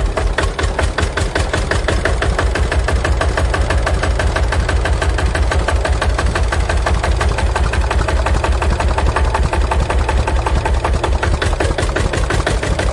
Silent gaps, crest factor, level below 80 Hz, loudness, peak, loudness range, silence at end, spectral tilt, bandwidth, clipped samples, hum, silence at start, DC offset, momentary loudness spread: none; 12 dB; -18 dBFS; -17 LUFS; -2 dBFS; 0 LU; 0 s; -5 dB/octave; 11.5 kHz; under 0.1%; none; 0 s; under 0.1%; 1 LU